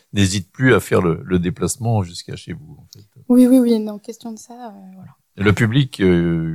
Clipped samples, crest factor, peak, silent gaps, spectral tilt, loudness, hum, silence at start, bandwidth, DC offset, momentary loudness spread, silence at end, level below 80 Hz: under 0.1%; 16 dB; -2 dBFS; none; -6 dB/octave; -17 LUFS; none; 0.15 s; 16 kHz; under 0.1%; 20 LU; 0 s; -46 dBFS